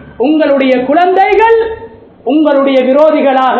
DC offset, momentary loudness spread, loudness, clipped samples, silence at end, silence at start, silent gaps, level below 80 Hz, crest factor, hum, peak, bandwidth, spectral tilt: under 0.1%; 6 LU; -9 LUFS; 0.5%; 0 s; 0.05 s; none; -44 dBFS; 8 dB; none; 0 dBFS; 7 kHz; -6.5 dB/octave